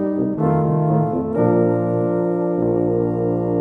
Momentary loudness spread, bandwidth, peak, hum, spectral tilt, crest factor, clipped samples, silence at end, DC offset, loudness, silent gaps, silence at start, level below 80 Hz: 3 LU; 2.9 kHz; -4 dBFS; none; -12.5 dB/octave; 14 dB; under 0.1%; 0 s; under 0.1%; -19 LUFS; none; 0 s; -48 dBFS